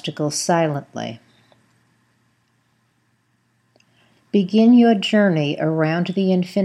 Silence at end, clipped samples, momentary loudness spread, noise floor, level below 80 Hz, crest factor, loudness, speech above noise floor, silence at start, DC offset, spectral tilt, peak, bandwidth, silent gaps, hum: 0 s; under 0.1%; 13 LU; -65 dBFS; -74 dBFS; 16 dB; -18 LUFS; 47 dB; 0.05 s; under 0.1%; -5.5 dB/octave; -4 dBFS; 12 kHz; none; none